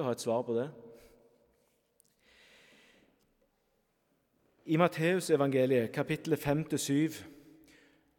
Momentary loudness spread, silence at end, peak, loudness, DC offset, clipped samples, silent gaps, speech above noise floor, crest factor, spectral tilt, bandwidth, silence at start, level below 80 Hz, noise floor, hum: 11 LU; 0.85 s; -12 dBFS; -31 LUFS; under 0.1%; under 0.1%; none; 45 dB; 22 dB; -5.5 dB/octave; 18 kHz; 0 s; -68 dBFS; -76 dBFS; none